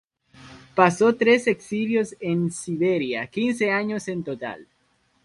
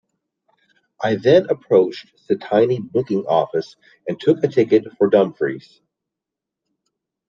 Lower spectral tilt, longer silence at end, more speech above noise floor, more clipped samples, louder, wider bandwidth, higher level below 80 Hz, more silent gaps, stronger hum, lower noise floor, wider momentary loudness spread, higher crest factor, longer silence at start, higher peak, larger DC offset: second, -5.5 dB/octave vs -7.5 dB/octave; second, 0.6 s vs 1.7 s; second, 44 dB vs 66 dB; neither; second, -23 LUFS vs -18 LUFS; first, 11.5 kHz vs 7.2 kHz; about the same, -64 dBFS vs -66 dBFS; neither; neither; second, -66 dBFS vs -84 dBFS; about the same, 12 LU vs 12 LU; about the same, 22 dB vs 18 dB; second, 0.4 s vs 1 s; about the same, -2 dBFS vs -2 dBFS; neither